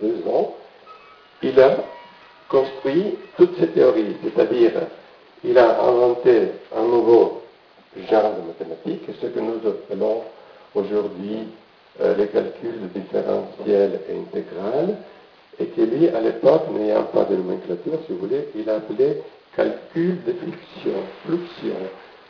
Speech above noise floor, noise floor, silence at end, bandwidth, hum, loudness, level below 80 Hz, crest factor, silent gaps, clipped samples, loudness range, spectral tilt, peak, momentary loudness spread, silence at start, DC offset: 29 dB; -48 dBFS; 0.25 s; 5.4 kHz; none; -21 LUFS; -64 dBFS; 18 dB; none; under 0.1%; 7 LU; -8.5 dB/octave; -4 dBFS; 14 LU; 0 s; under 0.1%